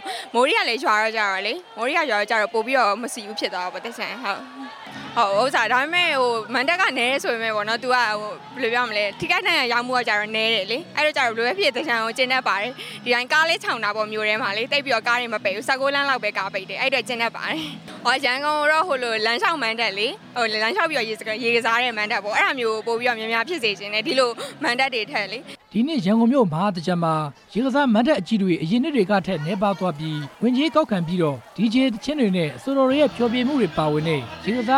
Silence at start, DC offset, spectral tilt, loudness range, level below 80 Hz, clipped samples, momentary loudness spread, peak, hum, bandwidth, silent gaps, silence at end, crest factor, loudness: 0 s; under 0.1%; -4.5 dB/octave; 2 LU; -62 dBFS; under 0.1%; 8 LU; -6 dBFS; none; 16 kHz; none; 0 s; 16 dB; -21 LUFS